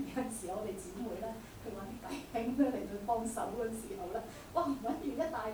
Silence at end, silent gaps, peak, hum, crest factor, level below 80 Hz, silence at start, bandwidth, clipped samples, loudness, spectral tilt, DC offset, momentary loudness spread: 0 s; none; -20 dBFS; none; 18 dB; -58 dBFS; 0 s; over 20 kHz; under 0.1%; -39 LUFS; -5 dB/octave; under 0.1%; 11 LU